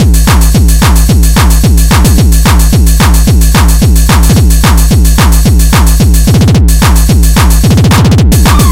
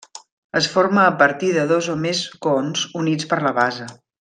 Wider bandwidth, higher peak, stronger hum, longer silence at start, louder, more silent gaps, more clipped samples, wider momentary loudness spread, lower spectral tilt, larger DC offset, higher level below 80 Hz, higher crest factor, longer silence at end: first, 16.5 kHz vs 10 kHz; about the same, 0 dBFS vs -2 dBFS; neither; second, 0 s vs 0.15 s; first, -6 LUFS vs -19 LUFS; second, none vs 0.32-0.50 s; first, 3% vs under 0.1%; second, 1 LU vs 8 LU; about the same, -5 dB/octave vs -4.5 dB/octave; first, 2% vs under 0.1%; first, -6 dBFS vs -64 dBFS; second, 4 dB vs 18 dB; second, 0 s vs 0.25 s